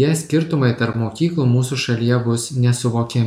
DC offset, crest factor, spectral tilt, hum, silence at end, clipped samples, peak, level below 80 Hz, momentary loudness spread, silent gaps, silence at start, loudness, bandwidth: under 0.1%; 14 dB; -6 dB/octave; none; 0 s; under 0.1%; -4 dBFS; -56 dBFS; 4 LU; none; 0 s; -18 LUFS; 15 kHz